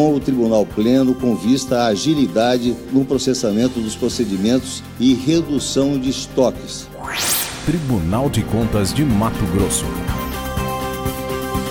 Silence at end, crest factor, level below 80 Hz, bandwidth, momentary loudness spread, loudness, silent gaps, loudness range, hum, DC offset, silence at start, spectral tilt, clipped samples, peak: 0 s; 14 dB; -34 dBFS; 16.5 kHz; 7 LU; -18 LUFS; none; 2 LU; none; under 0.1%; 0 s; -5 dB/octave; under 0.1%; -4 dBFS